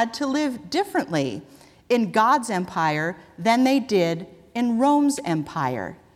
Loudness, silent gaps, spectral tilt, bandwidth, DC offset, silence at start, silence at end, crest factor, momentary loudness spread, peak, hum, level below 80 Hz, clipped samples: -23 LUFS; none; -5 dB/octave; 15 kHz; under 0.1%; 0 s; 0.2 s; 16 dB; 9 LU; -6 dBFS; none; -62 dBFS; under 0.1%